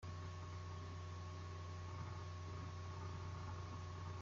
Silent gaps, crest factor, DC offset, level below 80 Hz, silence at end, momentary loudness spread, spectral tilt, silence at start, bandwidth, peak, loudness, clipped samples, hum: none; 12 dB; under 0.1%; -66 dBFS; 0 s; 1 LU; -5.5 dB/octave; 0 s; 7.6 kHz; -38 dBFS; -50 LUFS; under 0.1%; none